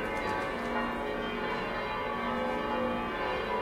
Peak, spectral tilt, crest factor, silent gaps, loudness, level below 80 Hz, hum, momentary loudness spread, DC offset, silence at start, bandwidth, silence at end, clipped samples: -18 dBFS; -5.5 dB/octave; 14 dB; none; -33 LUFS; -50 dBFS; none; 2 LU; under 0.1%; 0 s; 16 kHz; 0 s; under 0.1%